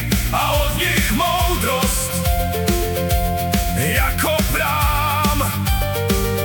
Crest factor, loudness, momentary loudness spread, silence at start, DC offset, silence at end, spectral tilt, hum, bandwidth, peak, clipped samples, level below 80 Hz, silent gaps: 16 dB; -18 LUFS; 2 LU; 0 s; under 0.1%; 0 s; -4 dB/octave; none; 19 kHz; -2 dBFS; under 0.1%; -24 dBFS; none